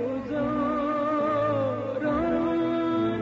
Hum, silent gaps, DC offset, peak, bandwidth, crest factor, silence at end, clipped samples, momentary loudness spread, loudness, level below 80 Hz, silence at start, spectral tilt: none; none; under 0.1%; -16 dBFS; 7.4 kHz; 10 dB; 0 s; under 0.1%; 4 LU; -26 LUFS; -52 dBFS; 0 s; -6 dB/octave